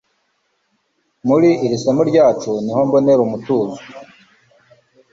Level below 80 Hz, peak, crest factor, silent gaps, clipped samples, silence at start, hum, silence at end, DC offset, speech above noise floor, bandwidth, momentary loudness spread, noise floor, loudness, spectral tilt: -58 dBFS; -2 dBFS; 16 dB; none; under 0.1%; 1.25 s; none; 1.1 s; under 0.1%; 51 dB; 7.8 kHz; 12 LU; -66 dBFS; -15 LUFS; -7 dB/octave